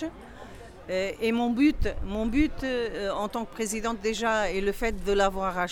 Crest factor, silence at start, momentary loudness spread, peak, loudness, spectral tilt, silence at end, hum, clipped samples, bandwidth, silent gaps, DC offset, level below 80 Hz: 16 dB; 0 s; 12 LU; -10 dBFS; -28 LUFS; -4.5 dB/octave; 0 s; none; under 0.1%; 18 kHz; none; under 0.1%; -38 dBFS